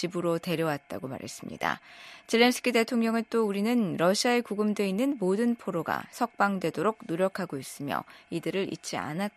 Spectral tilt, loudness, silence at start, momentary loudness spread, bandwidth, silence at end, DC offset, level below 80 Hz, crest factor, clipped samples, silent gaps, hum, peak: -5 dB/octave; -29 LUFS; 0 s; 12 LU; 14 kHz; 0.05 s; under 0.1%; -72 dBFS; 20 dB; under 0.1%; none; none; -8 dBFS